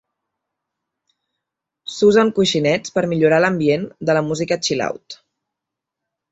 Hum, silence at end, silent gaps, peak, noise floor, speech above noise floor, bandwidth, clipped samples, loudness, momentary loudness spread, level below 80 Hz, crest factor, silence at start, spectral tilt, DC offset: none; 1.15 s; none; -2 dBFS; -83 dBFS; 66 dB; 8.2 kHz; under 0.1%; -17 LUFS; 17 LU; -58 dBFS; 18 dB; 1.85 s; -5 dB/octave; under 0.1%